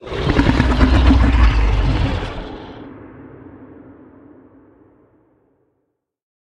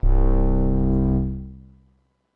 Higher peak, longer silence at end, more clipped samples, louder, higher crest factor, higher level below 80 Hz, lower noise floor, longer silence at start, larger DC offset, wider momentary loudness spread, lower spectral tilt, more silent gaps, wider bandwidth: first, 0 dBFS vs -8 dBFS; first, 2.95 s vs 0.8 s; neither; first, -16 LUFS vs -22 LUFS; first, 18 dB vs 12 dB; about the same, -20 dBFS vs -22 dBFS; first, -72 dBFS vs -63 dBFS; about the same, 0.05 s vs 0.05 s; neither; first, 25 LU vs 12 LU; second, -7.5 dB/octave vs -13.5 dB/octave; neither; first, 8 kHz vs 2 kHz